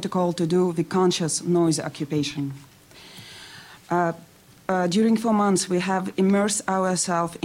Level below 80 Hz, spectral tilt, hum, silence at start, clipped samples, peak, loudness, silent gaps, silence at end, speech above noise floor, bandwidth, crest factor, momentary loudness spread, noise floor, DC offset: -62 dBFS; -5 dB/octave; none; 0 s; under 0.1%; -6 dBFS; -23 LUFS; none; 0.05 s; 24 dB; 16 kHz; 16 dB; 20 LU; -47 dBFS; under 0.1%